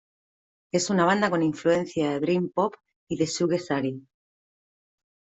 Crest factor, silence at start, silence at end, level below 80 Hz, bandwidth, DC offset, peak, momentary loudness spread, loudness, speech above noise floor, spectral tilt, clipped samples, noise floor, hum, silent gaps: 18 dB; 0.75 s; 1.35 s; -66 dBFS; 8.2 kHz; under 0.1%; -8 dBFS; 8 LU; -25 LUFS; over 65 dB; -5 dB/octave; under 0.1%; under -90 dBFS; none; 2.96-3.07 s